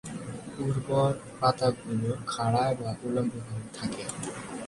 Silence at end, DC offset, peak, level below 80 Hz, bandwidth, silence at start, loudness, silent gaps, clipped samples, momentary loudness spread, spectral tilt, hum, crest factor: 0 s; under 0.1%; -10 dBFS; -58 dBFS; 11.5 kHz; 0.05 s; -30 LUFS; none; under 0.1%; 11 LU; -6 dB/octave; none; 20 dB